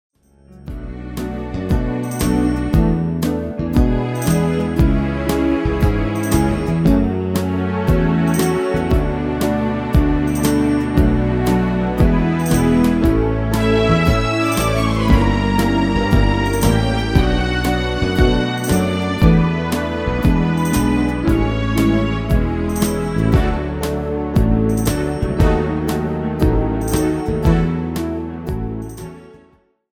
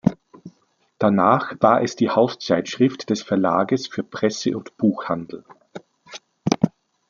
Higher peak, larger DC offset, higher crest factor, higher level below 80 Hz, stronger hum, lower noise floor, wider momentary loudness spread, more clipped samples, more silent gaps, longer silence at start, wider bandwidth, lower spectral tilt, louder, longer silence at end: about the same, 0 dBFS vs -2 dBFS; neither; about the same, 16 dB vs 20 dB; first, -24 dBFS vs -60 dBFS; neither; second, -53 dBFS vs -63 dBFS; second, 7 LU vs 23 LU; neither; neither; first, 0.5 s vs 0.05 s; first, 19.5 kHz vs 7.4 kHz; about the same, -6.5 dB/octave vs -6 dB/octave; first, -17 LUFS vs -21 LUFS; first, 0.65 s vs 0.4 s